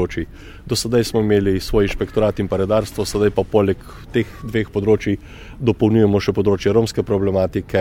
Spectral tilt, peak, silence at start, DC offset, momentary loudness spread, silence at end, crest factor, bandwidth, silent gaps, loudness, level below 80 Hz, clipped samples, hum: -6.5 dB/octave; -2 dBFS; 0 s; under 0.1%; 8 LU; 0 s; 16 dB; 16.5 kHz; none; -19 LUFS; -36 dBFS; under 0.1%; none